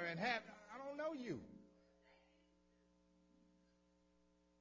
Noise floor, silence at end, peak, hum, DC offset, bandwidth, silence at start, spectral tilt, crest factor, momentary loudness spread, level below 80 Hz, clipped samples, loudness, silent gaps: -77 dBFS; 2.45 s; -26 dBFS; none; under 0.1%; 7.6 kHz; 0 s; -5 dB/octave; 24 dB; 18 LU; -82 dBFS; under 0.1%; -46 LUFS; none